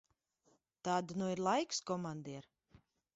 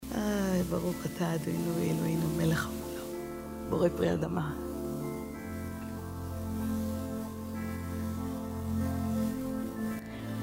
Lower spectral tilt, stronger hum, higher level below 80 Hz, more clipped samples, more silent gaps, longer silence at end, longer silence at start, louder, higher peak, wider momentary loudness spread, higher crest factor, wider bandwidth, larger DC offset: second, -4.5 dB/octave vs -6.5 dB/octave; neither; second, -78 dBFS vs -50 dBFS; neither; neither; first, 0.75 s vs 0 s; first, 0.85 s vs 0 s; second, -38 LUFS vs -34 LUFS; second, -22 dBFS vs -14 dBFS; first, 13 LU vs 9 LU; about the same, 20 dB vs 18 dB; second, 8 kHz vs 16 kHz; neither